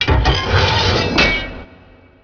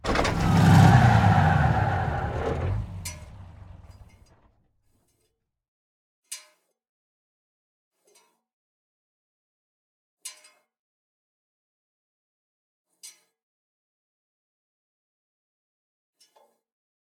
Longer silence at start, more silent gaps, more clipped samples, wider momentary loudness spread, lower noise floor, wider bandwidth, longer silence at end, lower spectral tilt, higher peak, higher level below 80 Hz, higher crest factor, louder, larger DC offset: about the same, 0 s vs 0.05 s; second, none vs 5.68-6.23 s, 6.89-7.91 s, 8.53-10.17 s, 10.79-12.85 s; neither; second, 12 LU vs 25 LU; second, -45 dBFS vs -76 dBFS; second, 5.4 kHz vs 15 kHz; second, 0.6 s vs 4.05 s; second, -5 dB/octave vs -6.5 dB/octave; first, 0 dBFS vs -4 dBFS; first, -24 dBFS vs -42 dBFS; second, 16 dB vs 24 dB; first, -14 LUFS vs -21 LUFS; neither